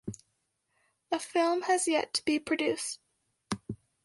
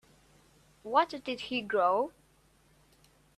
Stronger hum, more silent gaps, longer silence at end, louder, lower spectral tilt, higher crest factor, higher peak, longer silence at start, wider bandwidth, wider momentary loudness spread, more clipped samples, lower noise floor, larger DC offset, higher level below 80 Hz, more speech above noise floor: neither; neither; second, 0.3 s vs 1.25 s; about the same, -30 LUFS vs -31 LUFS; second, -3 dB/octave vs -4.5 dB/octave; about the same, 18 dB vs 22 dB; about the same, -14 dBFS vs -12 dBFS; second, 0.05 s vs 0.85 s; second, 11.5 kHz vs 13.5 kHz; first, 17 LU vs 10 LU; neither; first, -78 dBFS vs -65 dBFS; neither; about the same, -66 dBFS vs -70 dBFS; first, 49 dB vs 36 dB